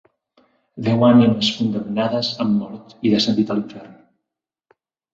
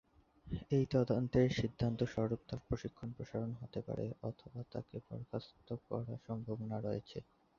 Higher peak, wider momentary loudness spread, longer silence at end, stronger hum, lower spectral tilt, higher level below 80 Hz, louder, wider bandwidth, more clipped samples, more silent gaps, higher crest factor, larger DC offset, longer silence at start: first, -2 dBFS vs -20 dBFS; about the same, 13 LU vs 14 LU; first, 1.2 s vs 0.35 s; neither; about the same, -6.5 dB/octave vs -7.5 dB/octave; about the same, -58 dBFS vs -58 dBFS; first, -18 LUFS vs -40 LUFS; about the same, 7.8 kHz vs 7.2 kHz; neither; neither; about the same, 18 dB vs 20 dB; neither; first, 0.75 s vs 0.45 s